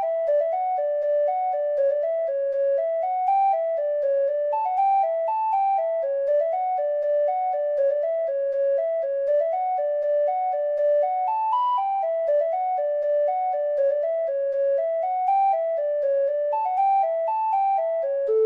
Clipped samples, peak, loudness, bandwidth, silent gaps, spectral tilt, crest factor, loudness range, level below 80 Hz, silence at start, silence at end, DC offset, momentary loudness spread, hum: under 0.1%; -14 dBFS; -23 LUFS; 4.1 kHz; none; -3 dB/octave; 10 dB; 1 LU; -76 dBFS; 0 s; 0 s; under 0.1%; 3 LU; none